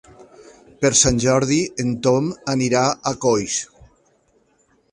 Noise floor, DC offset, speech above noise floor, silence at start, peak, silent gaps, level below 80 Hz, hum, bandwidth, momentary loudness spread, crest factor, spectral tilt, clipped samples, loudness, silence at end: -61 dBFS; under 0.1%; 42 dB; 0.8 s; -2 dBFS; none; -44 dBFS; none; 11.5 kHz; 9 LU; 18 dB; -4 dB/octave; under 0.1%; -19 LUFS; 1.25 s